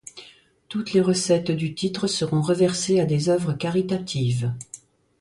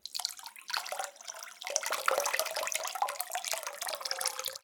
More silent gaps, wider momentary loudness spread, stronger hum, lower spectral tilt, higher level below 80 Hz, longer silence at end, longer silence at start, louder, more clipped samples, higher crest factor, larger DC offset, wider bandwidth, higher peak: neither; first, 14 LU vs 10 LU; neither; first, -5.5 dB/octave vs 3 dB/octave; first, -58 dBFS vs -82 dBFS; first, 0.45 s vs 0.05 s; about the same, 0.15 s vs 0.05 s; first, -23 LUFS vs -34 LUFS; neither; second, 18 dB vs 30 dB; neither; second, 11.5 kHz vs 19 kHz; about the same, -6 dBFS vs -6 dBFS